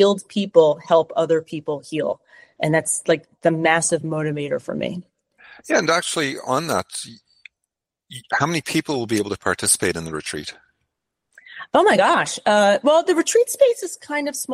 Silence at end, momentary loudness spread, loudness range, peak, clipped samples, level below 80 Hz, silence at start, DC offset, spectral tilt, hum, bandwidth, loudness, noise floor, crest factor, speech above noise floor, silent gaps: 0 s; 12 LU; 6 LU; -2 dBFS; under 0.1%; -60 dBFS; 0 s; under 0.1%; -3.5 dB/octave; none; 16 kHz; -20 LUFS; -81 dBFS; 18 dB; 62 dB; none